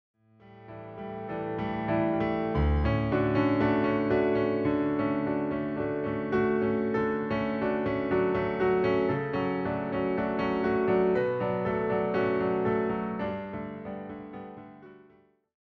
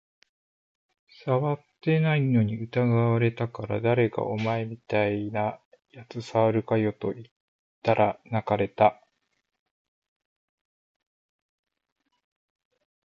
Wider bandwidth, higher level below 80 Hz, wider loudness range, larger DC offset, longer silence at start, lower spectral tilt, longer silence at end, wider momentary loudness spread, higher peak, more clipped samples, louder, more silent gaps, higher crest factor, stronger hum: second, 6 kHz vs 7.2 kHz; first, -44 dBFS vs -62 dBFS; about the same, 4 LU vs 4 LU; neither; second, 0.45 s vs 1.25 s; about the same, -9.5 dB/octave vs -8.5 dB/octave; second, 0.65 s vs 4.1 s; first, 13 LU vs 9 LU; second, -14 dBFS vs -6 dBFS; neither; about the same, -28 LUFS vs -26 LUFS; second, none vs 5.65-5.72 s, 7.31-7.82 s; second, 14 dB vs 22 dB; neither